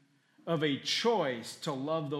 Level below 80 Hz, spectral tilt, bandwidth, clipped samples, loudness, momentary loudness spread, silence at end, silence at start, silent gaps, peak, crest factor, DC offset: -82 dBFS; -4.5 dB/octave; 15 kHz; under 0.1%; -32 LUFS; 9 LU; 0 s; 0.45 s; none; -16 dBFS; 16 dB; under 0.1%